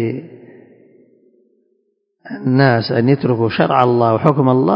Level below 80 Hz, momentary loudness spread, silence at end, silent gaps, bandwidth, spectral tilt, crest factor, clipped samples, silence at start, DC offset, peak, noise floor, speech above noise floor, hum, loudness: -56 dBFS; 10 LU; 0 s; none; 5.4 kHz; -10 dB/octave; 16 dB; under 0.1%; 0 s; under 0.1%; 0 dBFS; -66 dBFS; 52 dB; none; -14 LUFS